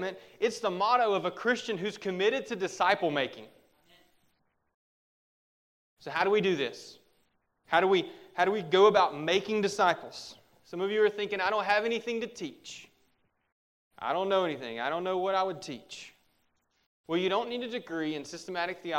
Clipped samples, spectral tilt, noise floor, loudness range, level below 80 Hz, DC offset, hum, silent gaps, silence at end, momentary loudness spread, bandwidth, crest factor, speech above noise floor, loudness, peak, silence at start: under 0.1%; -4.5 dB/octave; -74 dBFS; 7 LU; -76 dBFS; under 0.1%; none; 4.74-5.97 s, 13.52-13.91 s, 16.86-17.04 s; 0 s; 16 LU; 12.5 kHz; 22 dB; 44 dB; -29 LUFS; -10 dBFS; 0 s